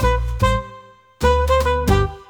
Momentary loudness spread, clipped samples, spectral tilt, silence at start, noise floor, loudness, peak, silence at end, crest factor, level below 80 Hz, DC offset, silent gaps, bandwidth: 6 LU; under 0.1%; -6 dB/octave; 0 s; -43 dBFS; -19 LUFS; -2 dBFS; 0.05 s; 16 dB; -24 dBFS; under 0.1%; none; 19 kHz